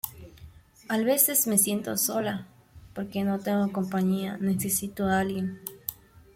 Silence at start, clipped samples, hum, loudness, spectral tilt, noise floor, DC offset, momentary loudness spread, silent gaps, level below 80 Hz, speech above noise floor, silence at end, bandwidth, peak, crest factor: 0.05 s; under 0.1%; none; -26 LUFS; -4 dB/octave; -50 dBFS; under 0.1%; 16 LU; none; -60 dBFS; 24 dB; 0.4 s; 16.5 kHz; -6 dBFS; 22 dB